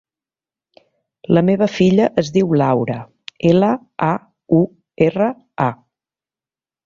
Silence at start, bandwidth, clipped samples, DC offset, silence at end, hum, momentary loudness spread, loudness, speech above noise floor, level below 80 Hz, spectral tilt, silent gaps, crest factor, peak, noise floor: 1.3 s; 7.4 kHz; under 0.1%; under 0.1%; 1.1 s; none; 10 LU; -17 LUFS; over 75 dB; -54 dBFS; -8 dB/octave; none; 16 dB; -2 dBFS; under -90 dBFS